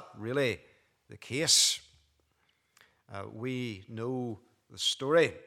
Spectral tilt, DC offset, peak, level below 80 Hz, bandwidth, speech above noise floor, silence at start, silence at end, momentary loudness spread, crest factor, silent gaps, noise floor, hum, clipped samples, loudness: -2.5 dB/octave; under 0.1%; -10 dBFS; -74 dBFS; 17 kHz; 43 dB; 0 s; 0.05 s; 21 LU; 22 dB; none; -74 dBFS; none; under 0.1%; -29 LUFS